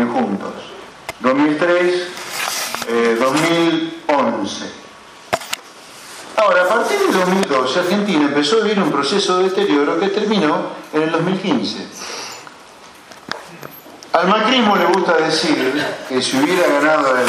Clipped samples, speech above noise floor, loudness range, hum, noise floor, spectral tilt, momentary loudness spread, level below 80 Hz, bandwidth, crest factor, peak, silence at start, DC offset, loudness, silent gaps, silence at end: under 0.1%; 25 dB; 5 LU; none; -41 dBFS; -4 dB/octave; 16 LU; -62 dBFS; 15.5 kHz; 18 dB; 0 dBFS; 0 s; under 0.1%; -16 LUFS; none; 0 s